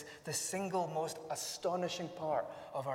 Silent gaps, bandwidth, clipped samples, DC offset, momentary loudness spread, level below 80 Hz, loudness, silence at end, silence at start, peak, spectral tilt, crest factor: none; 16 kHz; under 0.1%; under 0.1%; 4 LU; -76 dBFS; -38 LUFS; 0 s; 0 s; -24 dBFS; -3.5 dB/octave; 16 dB